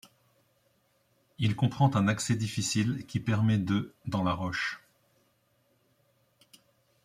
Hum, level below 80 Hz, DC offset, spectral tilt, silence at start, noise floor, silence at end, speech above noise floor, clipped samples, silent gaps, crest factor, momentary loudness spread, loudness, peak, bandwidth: none; -62 dBFS; under 0.1%; -5.5 dB/octave; 1.4 s; -71 dBFS; 2.25 s; 42 dB; under 0.1%; none; 20 dB; 7 LU; -29 LUFS; -10 dBFS; 15 kHz